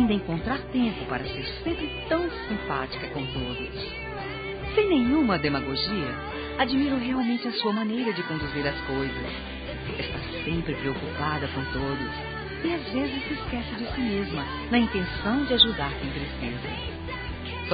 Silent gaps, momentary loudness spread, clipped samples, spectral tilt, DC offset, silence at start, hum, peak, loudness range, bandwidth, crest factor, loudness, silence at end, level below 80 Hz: none; 10 LU; under 0.1%; -3.5 dB/octave; under 0.1%; 0 s; none; -6 dBFS; 5 LU; 4.9 kHz; 22 dB; -28 LUFS; 0 s; -42 dBFS